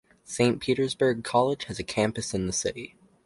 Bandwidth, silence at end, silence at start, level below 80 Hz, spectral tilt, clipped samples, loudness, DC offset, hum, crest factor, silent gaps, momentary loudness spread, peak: 11.5 kHz; 0.4 s; 0.3 s; -54 dBFS; -4.5 dB/octave; under 0.1%; -27 LUFS; under 0.1%; none; 18 dB; none; 10 LU; -8 dBFS